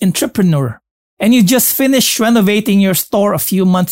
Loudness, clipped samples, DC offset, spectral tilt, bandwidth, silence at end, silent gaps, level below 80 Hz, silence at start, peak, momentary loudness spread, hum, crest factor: -12 LUFS; under 0.1%; 0.1%; -4.5 dB/octave; 16.5 kHz; 0 s; 0.91-1.17 s; -54 dBFS; 0 s; -2 dBFS; 4 LU; none; 10 dB